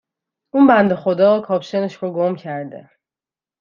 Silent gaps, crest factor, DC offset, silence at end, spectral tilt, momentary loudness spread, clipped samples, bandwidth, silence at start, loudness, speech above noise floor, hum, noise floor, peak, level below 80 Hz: none; 16 dB; under 0.1%; 0.8 s; -8 dB/octave; 15 LU; under 0.1%; 7.2 kHz; 0.55 s; -17 LUFS; over 74 dB; none; under -90 dBFS; -2 dBFS; -62 dBFS